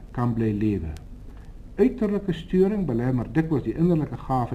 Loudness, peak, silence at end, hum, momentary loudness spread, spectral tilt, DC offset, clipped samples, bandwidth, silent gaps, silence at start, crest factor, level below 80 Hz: -24 LUFS; -8 dBFS; 0 s; none; 14 LU; -9.5 dB/octave; under 0.1%; under 0.1%; 12 kHz; none; 0 s; 16 dB; -40 dBFS